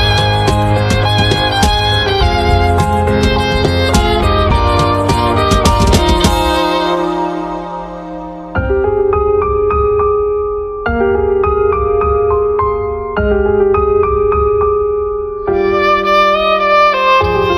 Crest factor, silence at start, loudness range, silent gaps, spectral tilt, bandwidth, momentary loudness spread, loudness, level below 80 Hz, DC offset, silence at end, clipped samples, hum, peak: 12 dB; 0 s; 3 LU; none; -5.5 dB/octave; 15 kHz; 8 LU; -12 LUFS; -22 dBFS; under 0.1%; 0 s; under 0.1%; none; 0 dBFS